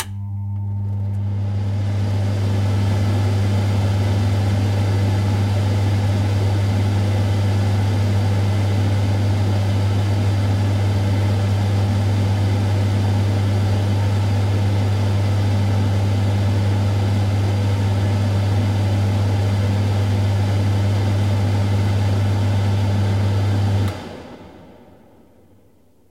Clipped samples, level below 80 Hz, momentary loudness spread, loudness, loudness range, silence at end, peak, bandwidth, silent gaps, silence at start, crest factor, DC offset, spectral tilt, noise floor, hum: under 0.1%; -42 dBFS; 2 LU; -19 LUFS; 1 LU; 1.4 s; -6 dBFS; 11.5 kHz; none; 0 s; 12 dB; under 0.1%; -7 dB/octave; -55 dBFS; none